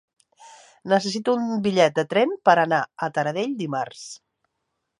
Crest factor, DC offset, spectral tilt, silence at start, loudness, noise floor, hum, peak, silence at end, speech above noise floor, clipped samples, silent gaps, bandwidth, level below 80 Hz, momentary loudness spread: 22 dB; under 0.1%; -5 dB/octave; 0.45 s; -22 LUFS; -78 dBFS; none; -2 dBFS; 0.85 s; 56 dB; under 0.1%; none; 11.5 kHz; -70 dBFS; 17 LU